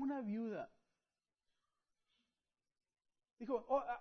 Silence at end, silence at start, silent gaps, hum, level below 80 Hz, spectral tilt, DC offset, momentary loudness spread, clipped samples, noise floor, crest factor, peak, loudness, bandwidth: 0 s; 0 s; 3.33-3.37 s; none; -78 dBFS; -6.5 dB/octave; under 0.1%; 14 LU; under 0.1%; under -90 dBFS; 20 dB; -26 dBFS; -42 LUFS; 6.2 kHz